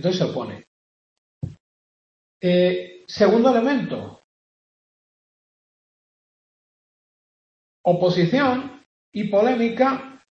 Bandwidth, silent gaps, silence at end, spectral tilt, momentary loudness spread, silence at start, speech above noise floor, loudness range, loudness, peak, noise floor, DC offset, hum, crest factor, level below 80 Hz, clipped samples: 7.2 kHz; 0.67-1.41 s, 1.60-2.40 s, 4.24-7.84 s, 8.86-9.12 s; 0.2 s; -7 dB/octave; 19 LU; 0 s; over 70 dB; 7 LU; -20 LUFS; -6 dBFS; under -90 dBFS; under 0.1%; none; 18 dB; -62 dBFS; under 0.1%